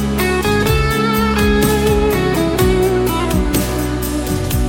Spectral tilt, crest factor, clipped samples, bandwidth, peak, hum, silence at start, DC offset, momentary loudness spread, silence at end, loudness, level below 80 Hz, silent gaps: -5.5 dB/octave; 12 dB; under 0.1%; 18 kHz; -2 dBFS; none; 0 s; under 0.1%; 5 LU; 0 s; -15 LUFS; -22 dBFS; none